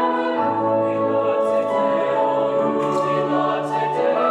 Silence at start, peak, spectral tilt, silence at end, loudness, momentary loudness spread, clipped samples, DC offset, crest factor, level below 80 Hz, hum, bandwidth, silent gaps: 0 s; -8 dBFS; -6.5 dB/octave; 0 s; -20 LUFS; 1 LU; under 0.1%; under 0.1%; 12 dB; -72 dBFS; none; 10 kHz; none